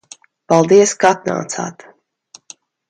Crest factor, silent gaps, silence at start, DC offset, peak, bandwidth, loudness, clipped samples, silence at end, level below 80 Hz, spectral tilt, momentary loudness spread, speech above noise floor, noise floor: 16 dB; none; 0.5 s; under 0.1%; 0 dBFS; 9.8 kHz; -14 LUFS; under 0.1%; 1.2 s; -62 dBFS; -4.5 dB/octave; 14 LU; 34 dB; -47 dBFS